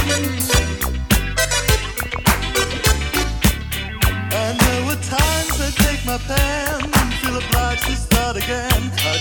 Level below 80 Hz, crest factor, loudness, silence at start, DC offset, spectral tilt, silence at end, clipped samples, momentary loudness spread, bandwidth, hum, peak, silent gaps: -24 dBFS; 18 dB; -18 LUFS; 0 s; under 0.1%; -3.5 dB/octave; 0 s; under 0.1%; 4 LU; over 20 kHz; none; 0 dBFS; none